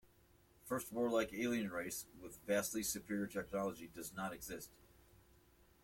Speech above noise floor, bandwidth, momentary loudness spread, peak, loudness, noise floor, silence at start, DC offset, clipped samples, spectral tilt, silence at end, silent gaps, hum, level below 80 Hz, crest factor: 28 dB; 16.5 kHz; 13 LU; -24 dBFS; -42 LUFS; -70 dBFS; 0.65 s; under 0.1%; under 0.1%; -4 dB/octave; 1.15 s; none; none; -68 dBFS; 20 dB